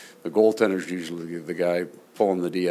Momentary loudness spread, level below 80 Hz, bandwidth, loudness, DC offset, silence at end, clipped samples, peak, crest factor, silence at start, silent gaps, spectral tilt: 12 LU; -70 dBFS; 15 kHz; -25 LUFS; under 0.1%; 0 s; under 0.1%; -4 dBFS; 20 dB; 0 s; none; -6 dB/octave